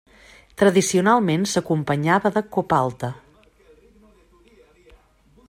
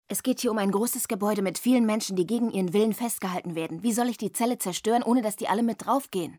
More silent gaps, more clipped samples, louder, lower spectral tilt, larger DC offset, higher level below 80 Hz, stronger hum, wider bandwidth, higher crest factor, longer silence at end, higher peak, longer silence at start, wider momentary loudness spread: neither; neither; first, -20 LUFS vs -26 LUFS; about the same, -5 dB/octave vs -4.5 dB/octave; neither; first, -56 dBFS vs -72 dBFS; neither; second, 16 kHz vs over 20 kHz; first, 20 dB vs 14 dB; first, 2.3 s vs 0 s; first, -4 dBFS vs -12 dBFS; first, 0.6 s vs 0.1 s; first, 14 LU vs 5 LU